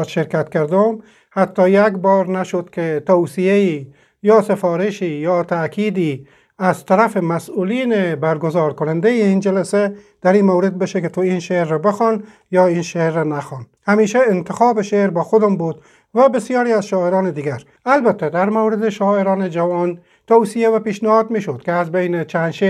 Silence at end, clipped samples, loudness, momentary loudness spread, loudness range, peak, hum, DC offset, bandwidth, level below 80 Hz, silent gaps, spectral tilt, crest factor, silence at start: 0 s; under 0.1%; -17 LUFS; 8 LU; 2 LU; 0 dBFS; none; under 0.1%; 12.5 kHz; -66 dBFS; none; -7 dB/octave; 16 dB; 0 s